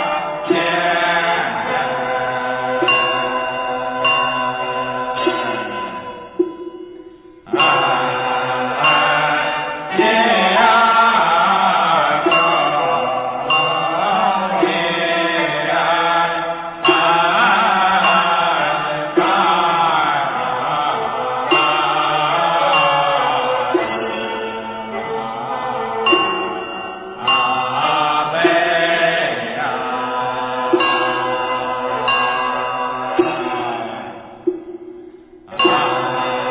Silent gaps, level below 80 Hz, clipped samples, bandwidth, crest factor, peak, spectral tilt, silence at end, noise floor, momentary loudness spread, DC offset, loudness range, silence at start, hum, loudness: none; -56 dBFS; under 0.1%; 4 kHz; 16 dB; 0 dBFS; -7.5 dB/octave; 0 s; -40 dBFS; 11 LU; under 0.1%; 6 LU; 0 s; none; -16 LUFS